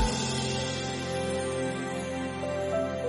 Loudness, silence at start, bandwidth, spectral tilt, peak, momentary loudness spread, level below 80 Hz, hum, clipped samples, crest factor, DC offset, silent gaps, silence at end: -31 LUFS; 0 s; 11.5 kHz; -4.5 dB/octave; -14 dBFS; 4 LU; -44 dBFS; none; under 0.1%; 16 dB; under 0.1%; none; 0 s